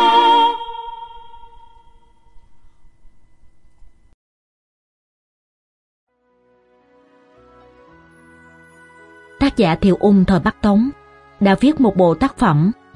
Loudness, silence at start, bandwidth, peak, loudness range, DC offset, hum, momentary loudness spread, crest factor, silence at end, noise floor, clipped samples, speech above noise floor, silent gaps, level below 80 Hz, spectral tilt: -15 LUFS; 0 s; 11 kHz; -2 dBFS; 13 LU; under 0.1%; none; 16 LU; 18 dB; 0.25 s; -59 dBFS; under 0.1%; 45 dB; 4.14-6.07 s; -42 dBFS; -7.5 dB/octave